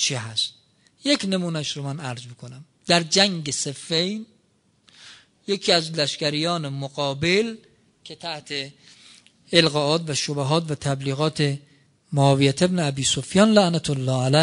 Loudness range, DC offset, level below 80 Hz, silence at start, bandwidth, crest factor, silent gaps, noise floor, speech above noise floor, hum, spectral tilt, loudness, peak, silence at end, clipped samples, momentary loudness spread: 4 LU; under 0.1%; -60 dBFS; 0 s; 10.5 kHz; 22 dB; none; -64 dBFS; 42 dB; none; -4 dB/octave; -22 LUFS; -2 dBFS; 0 s; under 0.1%; 15 LU